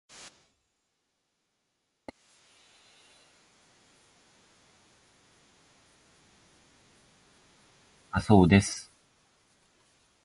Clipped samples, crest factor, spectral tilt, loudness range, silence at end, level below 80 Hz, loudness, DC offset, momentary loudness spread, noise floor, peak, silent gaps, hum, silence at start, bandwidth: under 0.1%; 26 dB; -6 dB/octave; 4 LU; 1.45 s; -50 dBFS; -24 LUFS; under 0.1%; 31 LU; -79 dBFS; -8 dBFS; none; none; 8.15 s; 11.5 kHz